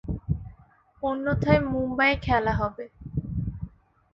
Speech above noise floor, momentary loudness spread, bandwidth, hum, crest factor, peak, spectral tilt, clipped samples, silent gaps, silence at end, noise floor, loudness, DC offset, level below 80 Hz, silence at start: 32 dB; 16 LU; 7.2 kHz; none; 22 dB; -4 dBFS; -8.5 dB/octave; under 0.1%; none; 0.45 s; -56 dBFS; -26 LUFS; under 0.1%; -40 dBFS; 0.05 s